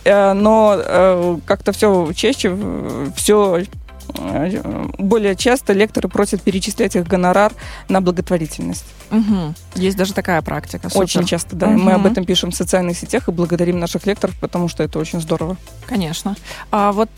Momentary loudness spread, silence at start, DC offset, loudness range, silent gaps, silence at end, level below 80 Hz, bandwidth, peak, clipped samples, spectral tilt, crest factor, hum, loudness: 11 LU; 0 s; under 0.1%; 4 LU; none; 0.1 s; -38 dBFS; 16.5 kHz; -2 dBFS; under 0.1%; -5 dB/octave; 14 dB; none; -17 LUFS